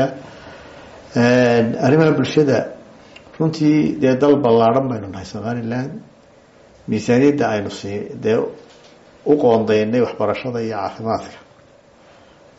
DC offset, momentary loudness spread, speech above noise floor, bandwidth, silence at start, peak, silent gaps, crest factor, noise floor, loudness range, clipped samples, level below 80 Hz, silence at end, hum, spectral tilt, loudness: under 0.1%; 16 LU; 32 dB; 8 kHz; 0 s; -2 dBFS; none; 16 dB; -49 dBFS; 5 LU; under 0.1%; -54 dBFS; 1.2 s; none; -6 dB/octave; -17 LUFS